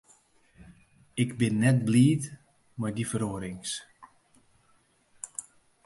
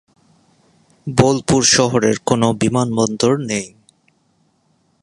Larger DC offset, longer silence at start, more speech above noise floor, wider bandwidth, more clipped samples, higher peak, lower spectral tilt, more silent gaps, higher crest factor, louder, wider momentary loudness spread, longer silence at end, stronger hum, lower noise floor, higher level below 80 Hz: neither; second, 0.6 s vs 1.05 s; second, 40 dB vs 46 dB; about the same, 11.5 kHz vs 11.5 kHz; neither; second, -10 dBFS vs 0 dBFS; first, -6 dB/octave vs -4 dB/octave; neither; about the same, 20 dB vs 18 dB; second, -28 LUFS vs -16 LUFS; first, 18 LU vs 11 LU; second, 0.45 s vs 1.35 s; neither; first, -66 dBFS vs -61 dBFS; second, -62 dBFS vs -48 dBFS